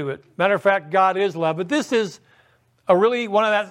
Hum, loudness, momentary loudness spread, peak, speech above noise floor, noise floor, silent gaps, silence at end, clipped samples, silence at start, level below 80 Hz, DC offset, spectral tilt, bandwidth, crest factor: none; -20 LUFS; 7 LU; -4 dBFS; 39 dB; -59 dBFS; none; 0 s; under 0.1%; 0 s; -72 dBFS; under 0.1%; -5 dB/octave; 12.5 kHz; 18 dB